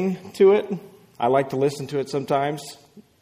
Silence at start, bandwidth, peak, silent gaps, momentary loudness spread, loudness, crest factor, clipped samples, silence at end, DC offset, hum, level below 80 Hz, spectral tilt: 0 s; 15.5 kHz; -6 dBFS; none; 16 LU; -22 LUFS; 16 dB; under 0.1%; 0.2 s; under 0.1%; none; -66 dBFS; -6.5 dB/octave